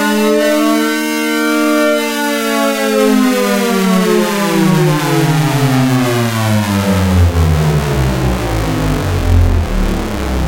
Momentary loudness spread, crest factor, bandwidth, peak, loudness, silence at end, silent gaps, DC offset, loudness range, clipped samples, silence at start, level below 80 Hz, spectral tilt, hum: 4 LU; 10 dB; 17 kHz; -2 dBFS; -13 LUFS; 0 s; none; under 0.1%; 2 LU; under 0.1%; 0 s; -22 dBFS; -5.5 dB/octave; none